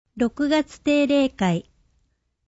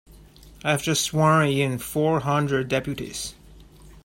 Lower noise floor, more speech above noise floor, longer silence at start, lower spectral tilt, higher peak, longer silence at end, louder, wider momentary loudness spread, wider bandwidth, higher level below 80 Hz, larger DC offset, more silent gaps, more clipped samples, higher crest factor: first, -69 dBFS vs -48 dBFS; first, 47 dB vs 25 dB; about the same, 0.15 s vs 0.1 s; first, -6 dB/octave vs -4.5 dB/octave; about the same, -8 dBFS vs -6 dBFS; first, 0.9 s vs 0.05 s; about the same, -22 LUFS vs -23 LUFS; second, 6 LU vs 12 LU; second, 8 kHz vs 16.5 kHz; about the same, -54 dBFS vs -50 dBFS; neither; neither; neither; about the same, 16 dB vs 18 dB